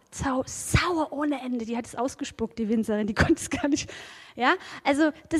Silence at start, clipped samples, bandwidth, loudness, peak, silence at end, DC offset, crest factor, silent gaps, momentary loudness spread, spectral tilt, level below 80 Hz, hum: 0.1 s; under 0.1%; 15 kHz; -27 LUFS; -6 dBFS; 0 s; under 0.1%; 20 dB; none; 9 LU; -4.5 dB/octave; -44 dBFS; none